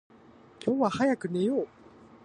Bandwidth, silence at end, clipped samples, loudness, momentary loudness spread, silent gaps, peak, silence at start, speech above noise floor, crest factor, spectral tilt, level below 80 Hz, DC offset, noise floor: 10 kHz; 0.6 s; under 0.1%; -28 LUFS; 8 LU; none; -14 dBFS; 0.6 s; 28 dB; 16 dB; -6.5 dB/octave; -68 dBFS; under 0.1%; -55 dBFS